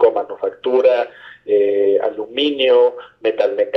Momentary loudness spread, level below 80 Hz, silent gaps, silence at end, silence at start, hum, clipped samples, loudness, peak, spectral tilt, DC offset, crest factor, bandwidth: 9 LU; -64 dBFS; none; 0 s; 0 s; none; under 0.1%; -17 LUFS; -2 dBFS; -5 dB/octave; under 0.1%; 14 dB; 5.8 kHz